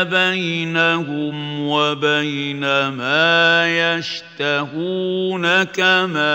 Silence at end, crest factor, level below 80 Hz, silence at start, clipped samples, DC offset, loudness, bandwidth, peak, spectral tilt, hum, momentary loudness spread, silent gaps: 0 s; 16 dB; -68 dBFS; 0 s; under 0.1%; under 0.1%; -17 LUFS; 16 kHz; -2 dBFS; -4.5 dB/octave; none; 9 LU; none